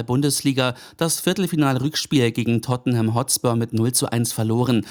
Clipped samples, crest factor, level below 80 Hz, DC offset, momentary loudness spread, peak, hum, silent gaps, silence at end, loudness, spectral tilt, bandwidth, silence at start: under 0.1%; 16 dB; -56 dBFS; under 0.1%; 3 LU; -6 dBFS; none; none; 0 s; -21 LUFS; -5 dB/octave; over 20 kHz; 0 s